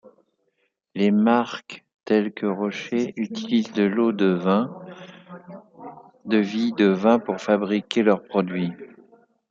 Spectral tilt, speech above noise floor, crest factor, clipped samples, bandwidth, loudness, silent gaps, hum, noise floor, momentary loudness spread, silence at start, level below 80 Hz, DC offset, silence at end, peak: -7 dB/octave; 50 dB; 20 dB; under 0.1%; 7.4 kHz; -22 LUFS; 1.94-1.99 s; none; -72 dBFS; 22 LU; 0.95 s; -70 dBFS; under 0.1%; 0.65 s; -4 dBFS